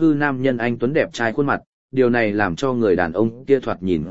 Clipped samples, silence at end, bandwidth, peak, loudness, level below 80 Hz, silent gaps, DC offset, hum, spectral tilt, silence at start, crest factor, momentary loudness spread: under 0.1%; 0 s; 8 kHz; -2 dBFS; -20 LUFS; -48 dBFS; 1.67-1.89 s; 1%; none; -7 dB/octave; 0 s; 18 dB; 5 LU